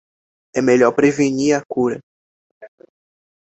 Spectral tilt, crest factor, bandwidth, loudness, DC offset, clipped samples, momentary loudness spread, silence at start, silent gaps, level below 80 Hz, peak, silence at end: -5.5 dB/octave; 18 dB; 8.2 kHz; -17 LUFS; under 0.1%; under 0.1%; 9 LU; 0.55 s; 2.03-2.61 s; -58 dBFS; -2 dBFS; 0.8 s